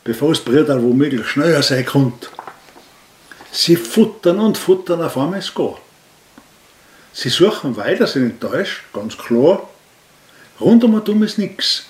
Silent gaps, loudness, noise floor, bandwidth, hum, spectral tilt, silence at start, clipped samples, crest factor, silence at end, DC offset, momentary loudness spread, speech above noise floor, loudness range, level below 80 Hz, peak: none; -16 LUFS; -49 dBFS; 16 kHz; none; -5.5 dB/octave; 0.05 s; under 0.1%; 16 dB; 0.05 s; under 0.1%; 10 LU; 34 dB; 3 LU; -60 dBFS; 0 dBFS